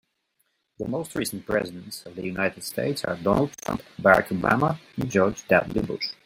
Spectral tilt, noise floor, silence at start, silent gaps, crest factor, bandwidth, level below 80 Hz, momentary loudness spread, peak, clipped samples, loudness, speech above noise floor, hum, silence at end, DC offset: -5.5 dB/octave; -73 dBFS; 0.8 s; none; 24 dB; 16.5 kHz; -52 dBFS; 13 LU; -2 dBFS; under 0.1%; -25 LUFS; 48 dB; none; 0.15 s; under 0.1%